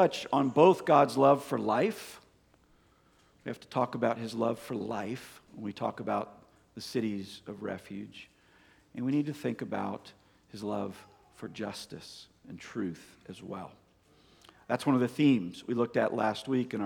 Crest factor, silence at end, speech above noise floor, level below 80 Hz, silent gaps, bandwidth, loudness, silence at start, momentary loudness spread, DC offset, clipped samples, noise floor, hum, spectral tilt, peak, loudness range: 24 dB; 0 s; 35 dB; -72 dBFS; none; 18.5 kHz; -30 LUFS; 0 s; 23 LU; under 0.1%; under 0.1%; -65 dBFS; none; -6.5 dB/octave; -8 dBFS; 11 LU